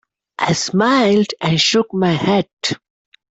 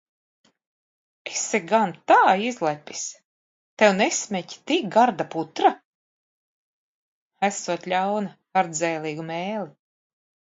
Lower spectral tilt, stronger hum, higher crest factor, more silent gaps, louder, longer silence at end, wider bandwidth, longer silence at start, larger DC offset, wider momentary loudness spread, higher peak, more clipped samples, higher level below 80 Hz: about the same, -4.5 dB/octave vs -3.5 dB/octave; neither; second, 14 dB vs 20 dB; second, 2.53-2.57 s vs 3.25-3.77 s, 5.85-7.30 s; first, -16 LUFS vs -23 LUFS; second, 0.6 s vs 0.85 s; about the same, 8.2 kHz vs 8 kHz; second, 0.4 s vs 1.25 s; neither; second, 9 LU vs 13 LU; about the same, -4 dBFS vs -4 dBFS; neither; first, -56 dBFS vs -76 dBFS